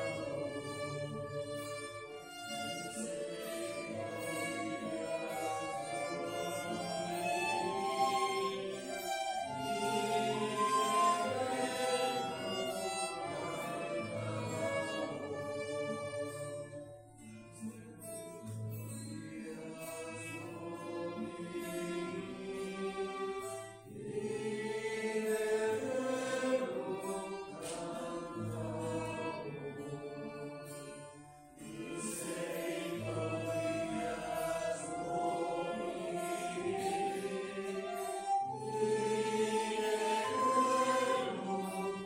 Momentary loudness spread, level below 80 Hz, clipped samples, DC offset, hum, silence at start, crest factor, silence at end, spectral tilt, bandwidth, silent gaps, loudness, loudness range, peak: 12 LU; -70 dBFS; under 0.1%; under 0.1%; none; 0 s; 18 dB; 0 s; -4 dB/octave; 16 kHz; none; -38 LUFS; 10 LU; -20 dBFS